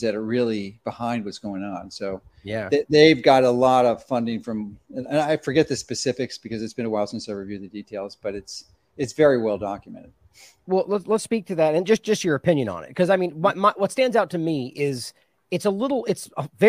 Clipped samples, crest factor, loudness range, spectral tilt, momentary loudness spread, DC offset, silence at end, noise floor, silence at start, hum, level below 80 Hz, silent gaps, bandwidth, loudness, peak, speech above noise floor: under 0.1%; 22 dB; 7 LU; -5.5 dB/octave; 15 LU; under 0.1%; 0 s; -52 dBFS; 0 s; none; -60 dBFS; none; 15.5 kHz; -23 LUFS; 0 dBFS; 30 dB